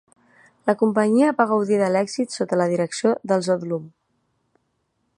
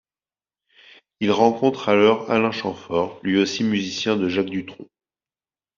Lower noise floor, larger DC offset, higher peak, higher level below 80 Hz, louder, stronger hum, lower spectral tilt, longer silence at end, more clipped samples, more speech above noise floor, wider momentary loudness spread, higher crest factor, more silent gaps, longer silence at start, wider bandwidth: second, -71 dBFS vs under -90 dBFS; neither; about the same, -2 dBFS vs -2 dBFS; second, -72 dBFS vs -64 dBFS; about the same, -21 LUFS vs -21 LUFS; neither; first, -6 dB/octave vs -4 dB/octave; first, 1.3 s vs 0.95 s; neither; second, 51 dB vs over 70 dB; about the same, 8 LU vs 9 LU; about the same, 20 dB vs 20 dB; neither; second, 0.65 s vs 1.2 s; first, 11.5 kHz vs 7.4 kHz